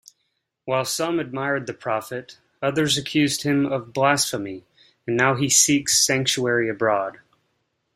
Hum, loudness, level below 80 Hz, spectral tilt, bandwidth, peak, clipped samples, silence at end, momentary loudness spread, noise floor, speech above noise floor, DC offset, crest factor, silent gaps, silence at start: none; -21 LUFS; -62 dBFS; -3 dB/octave; 16 kHz; -2 dBFS; under 0.1%; 0.85 s; 15 LU; -74 dBFS; 53 dB; under 0.1%; 20 dB; none; 0.65 s